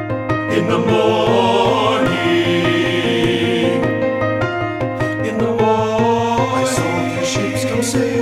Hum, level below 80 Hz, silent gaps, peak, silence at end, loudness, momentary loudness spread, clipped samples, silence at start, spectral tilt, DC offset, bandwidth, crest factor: none; -44 dBFS; none; -2 dBFS; 0 s; -16 LUFS; 5 LU; under 0.1%; 0 s; -5 dB/octave; under 0.1%; 15.5 kHz; 14 dB